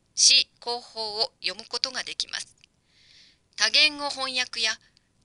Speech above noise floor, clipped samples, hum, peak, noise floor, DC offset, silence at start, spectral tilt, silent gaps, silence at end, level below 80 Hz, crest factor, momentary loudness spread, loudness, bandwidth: 35 dB; under 0.1%; none; -4 dBFS; -61 dBFS; under 0.1%; 0.15 s; 2 dB/octave; none; 0.5 s; -70 dBFS; 24 dB; 16 LU; -23 LUFS; 11.5 kHz